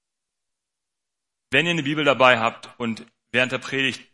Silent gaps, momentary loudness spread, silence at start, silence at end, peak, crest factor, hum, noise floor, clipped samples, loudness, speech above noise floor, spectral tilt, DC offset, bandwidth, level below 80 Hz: none; 13 LU; 1.5 s; 0.1 s; 0 dBFS; 22 dB; none; -85 dBFS; under 0.1%; -21 LUFS; 63 dB; -4.5 dB/octave; under 0.1%; 11.5 kHz; -68 dBFS